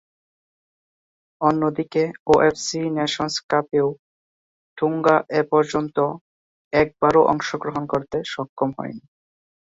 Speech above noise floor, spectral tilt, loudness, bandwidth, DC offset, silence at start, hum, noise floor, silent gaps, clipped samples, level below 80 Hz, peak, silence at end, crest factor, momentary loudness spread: over 69 dB; -5 dB/octave; -21 LUFS; 8 kHz; under 0.1%; 1.4 s; none; under -90 dBFS; 2.19-2.26 s, 3.43-3.49 s, 3.99-4.76 s, 6.21-6.71 s, 8.49-8.57 s; under 0.1%; -56 dBFS; -2 dBFS; 0.7 s; 20 dB; 10 LU